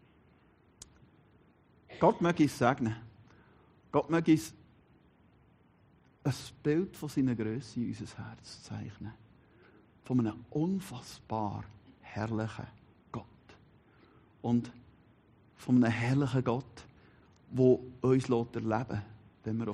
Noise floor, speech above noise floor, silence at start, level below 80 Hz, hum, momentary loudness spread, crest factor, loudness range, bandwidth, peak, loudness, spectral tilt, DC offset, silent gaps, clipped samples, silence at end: -64 dBFS; 33 dB; 1.9 s; -66 dBFS; none; 19 LU; 24 dB; 8 LU; 11.5 kHz; -10 dBFS; -32 LUFS; -7 dB/octave; under 0.1%; none; under 0.1%; 0 s